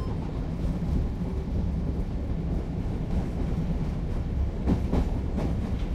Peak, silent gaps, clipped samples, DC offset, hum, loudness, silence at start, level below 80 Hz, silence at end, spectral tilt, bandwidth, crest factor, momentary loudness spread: -12 dBFS; none; under 0.1%; under 0.1%; none; -30 LUFS; 0 s; -30 dBFS; 0 s; -9 dB/octave; 8.4 kHz; 16 dB; 4 LU